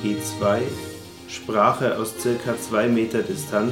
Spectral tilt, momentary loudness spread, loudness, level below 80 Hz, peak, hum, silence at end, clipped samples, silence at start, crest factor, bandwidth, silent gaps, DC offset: -5 dB/octave; 14 LU; -23 LUFS; -60 dBFS; -4 dBFS; none; 0 s; under 0.1%; 0 s; 20 dB; 17 kHz; none; under 0.1%